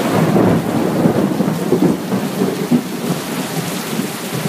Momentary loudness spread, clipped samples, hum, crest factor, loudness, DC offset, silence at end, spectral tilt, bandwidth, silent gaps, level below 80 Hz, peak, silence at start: 7 LU; under 0.1%; none; 16 dB; -17 LUFS; under 0.1%; 0 s; -6 dB/octave; 15.5 kHz; none; -50 dBFS; -2 dBFS; 0 s